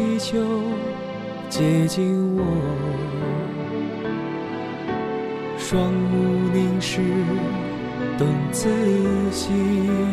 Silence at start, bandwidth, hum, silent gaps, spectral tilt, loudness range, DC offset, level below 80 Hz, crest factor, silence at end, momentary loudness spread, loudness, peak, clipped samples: 0 s; 14 kHz; none; none; -6.5 dB/octave; 4 LU; under 0.1%; -48 dBFS; 14 dB; 0 s; 8 LU; -23 LUFS; -8 dBFS; under 0.1%